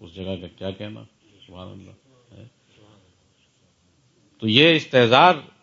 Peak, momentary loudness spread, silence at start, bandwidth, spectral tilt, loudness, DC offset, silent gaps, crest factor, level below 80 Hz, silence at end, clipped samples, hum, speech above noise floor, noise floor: 0 dBFS; 26 LU; 0 s; 7.6 kHz; -5.5 dB/octave; -16 LUFS; under 0.1%; none; 22 dB; -64 dBFS; 0.2 s; under 0.1%; none; 42 dB; -62 dBFS